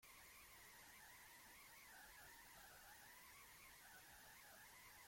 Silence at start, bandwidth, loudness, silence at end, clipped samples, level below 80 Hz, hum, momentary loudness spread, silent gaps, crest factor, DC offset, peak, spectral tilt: 0 s; 16.5 kHz; -62 LUFS; 0 s; under 0.1%; -80 dBFS; none; 1 LU; none; 12 dB; under 0.1%; -52 dBFS; -1 dB/octave